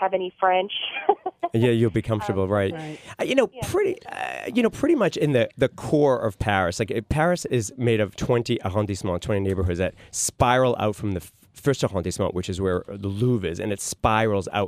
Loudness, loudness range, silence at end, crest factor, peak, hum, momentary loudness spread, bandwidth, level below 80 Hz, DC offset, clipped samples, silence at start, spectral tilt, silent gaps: -24 LUFS; 2 LU; 0 s; 20 dB; -4 dBFS; none; 7 LU; 15.5 kHz; -46 dBFS; under 0.1%; under 0.1%; 0 s; -5.5 dB/octave; none